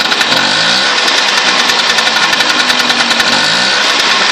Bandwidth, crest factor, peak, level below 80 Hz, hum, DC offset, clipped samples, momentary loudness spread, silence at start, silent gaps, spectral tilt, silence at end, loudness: 16 kHz; 10 dB; 0 dBFS; -52 dBFS; none; under 0.1%; under 0.1%; 0 LU; 0 s; none; -0.5 dB/octave; 0 s; -8 LUFS